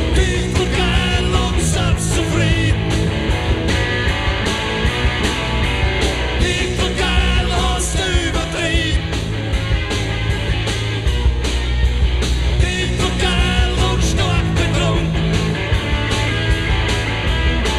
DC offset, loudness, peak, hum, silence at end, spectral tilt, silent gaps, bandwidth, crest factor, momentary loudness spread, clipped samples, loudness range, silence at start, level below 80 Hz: under 0.1%; -18 LUFS; -2 dBFS; none; 0 s; -4.5 dB/octave; none; 13 kHz; 14 dB; 3 LU; under 0.1%; 2 LU; 0 s; -20 dBFS